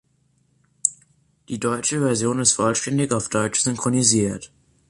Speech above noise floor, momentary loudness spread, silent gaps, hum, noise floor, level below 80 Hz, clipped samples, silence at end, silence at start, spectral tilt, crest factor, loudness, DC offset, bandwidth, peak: 43 dB; 8 LU; none; none; -64 dBFS; -54 dBFS; under 0.1%; 0.45 s; 0.85 s; -3.5 dB/octave; 22 dB; -20 LUFS; under 0.1%; 11.5 kHz; -2 dBFS